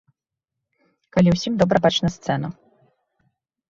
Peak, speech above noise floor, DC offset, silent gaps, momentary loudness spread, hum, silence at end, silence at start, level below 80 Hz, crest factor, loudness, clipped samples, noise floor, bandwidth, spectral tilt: -2 dBFS; 65 dB; under 0.1%; none; 8 LU; none; 1.15 s; 1.15 s; -50 dBFS; 20 dB; -20 LUFS; under 0.1%; -84 dBFS; 7.6 kHz; -6 dB/octave